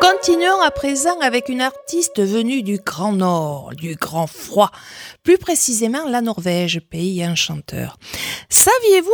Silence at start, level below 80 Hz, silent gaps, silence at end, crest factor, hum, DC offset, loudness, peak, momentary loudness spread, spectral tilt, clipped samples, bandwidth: 0 s; -50 dBFS; none; 0 s; 18 dB; none; under 0.1%; -17 LUFS; 0 dBFS; 13 LU; -3 dB/octave; under 0.1%; over 20 kHz